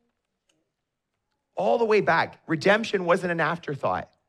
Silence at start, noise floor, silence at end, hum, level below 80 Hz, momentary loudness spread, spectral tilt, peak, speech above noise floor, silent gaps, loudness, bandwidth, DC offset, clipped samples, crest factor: 1.55 s; -81 dBFS; 0.25 s; none; -68 dBFS; 8 LU; -5.5 dB/octave; -8 dBFS; 57 dB; none; -24 LUFS; 12 kHz; under 0.1%; under 0.1%; 18 dB